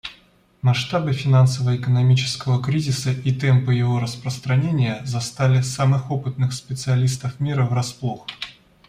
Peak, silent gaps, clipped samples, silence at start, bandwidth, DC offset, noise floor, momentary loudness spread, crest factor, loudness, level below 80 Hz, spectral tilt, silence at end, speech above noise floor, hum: -6 dBFS; none; under 0.1%; 0.05 s; 11 kHz; under 0.1%; -55 dBFS; 10 LU; 14 dB; -21 LUFS; -54 dBFS; -6 dB/octave; 0.35 s; 35 dB; none